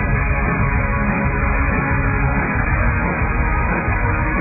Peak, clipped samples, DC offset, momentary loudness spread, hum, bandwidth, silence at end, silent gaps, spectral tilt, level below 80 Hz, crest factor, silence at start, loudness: -4 dBFS; under 0.1%; under 0.1%; 1 LU; none; 2.7 kHz; 0 s; none; -15 dB/octave; -22 dBFS; 12 dB; 0 s; -18 LUFS